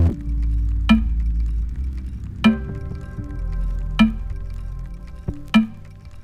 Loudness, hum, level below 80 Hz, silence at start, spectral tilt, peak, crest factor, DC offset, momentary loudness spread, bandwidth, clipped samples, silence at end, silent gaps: -23 LUFS; none; -24 dBFS; 0 s; -7 dB/octave; -2 dBFS; 20 dB; under 0.1%; 15 LU; 9.8 kHz; under 0.1%; 0 s; none